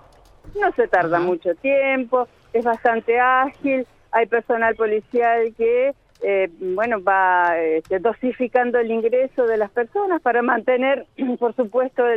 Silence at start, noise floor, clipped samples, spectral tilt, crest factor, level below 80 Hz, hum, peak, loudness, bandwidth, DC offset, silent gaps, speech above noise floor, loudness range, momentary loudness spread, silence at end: 0.45 s; -45 dBFS; under 0.1%; -7 dB/octave; 14 dB; -56 dBFS; none; -4 dBFS; -20 LUFS; 5.6 kHz; under 0.1%; none; 25 dB; 1 LU; 5 LU; 0 s